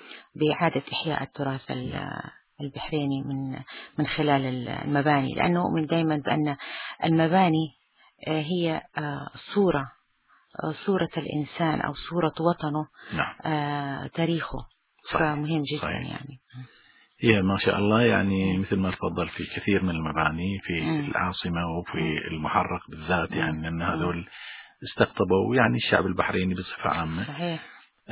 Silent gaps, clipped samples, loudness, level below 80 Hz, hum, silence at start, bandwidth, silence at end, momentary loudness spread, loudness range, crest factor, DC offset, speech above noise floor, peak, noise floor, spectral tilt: none; under 0.1%; -27 LUFS; -48 dBFS; none; 0 s; 4 kHz; 0 s; 14 LU; 5 LU; 24 dB; under 0.1%; 38 dB; -2 dBFS; -64 dBFS; -5 dB/octave